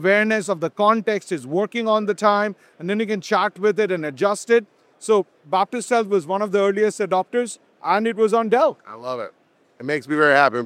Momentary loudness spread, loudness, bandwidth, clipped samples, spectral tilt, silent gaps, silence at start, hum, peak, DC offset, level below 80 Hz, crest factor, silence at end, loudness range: 12 LU; -20 LUFS; 13.5 kHz; under 0.1%; -4.5 dB/octave; none; 0 s; none; -2 dBFS; under 0.1%; -80 dBFS; 18 dB; 0 s; 1 LU